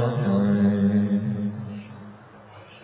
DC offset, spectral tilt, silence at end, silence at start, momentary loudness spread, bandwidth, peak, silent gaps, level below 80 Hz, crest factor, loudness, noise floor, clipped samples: under 0.1%; -12.5 dB/octave; 0.05 s; 0 s; 22 LU; 4 kHz; -12 dBFS; none; -54 dBFS; 12 dB; -23 LUFS; -46 dBFS; under 0.1%